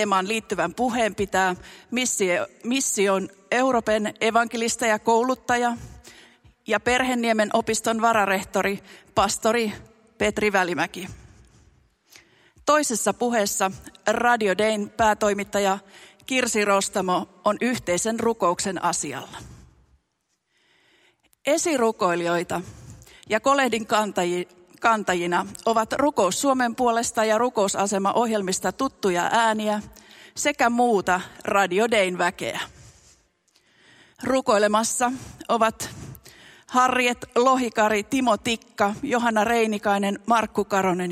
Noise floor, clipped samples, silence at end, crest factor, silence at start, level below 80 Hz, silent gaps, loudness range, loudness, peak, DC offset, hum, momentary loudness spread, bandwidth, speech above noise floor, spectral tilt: -74 dBFS; under 0.1%; 0 s; 18 dB; 0 s; -56 dBFS; none; 4 LU; -23 LUFS; -4 dBFS; under 0.1%; none; 9 LU; 16 kHz; 51 dB; -3.5 dB/octave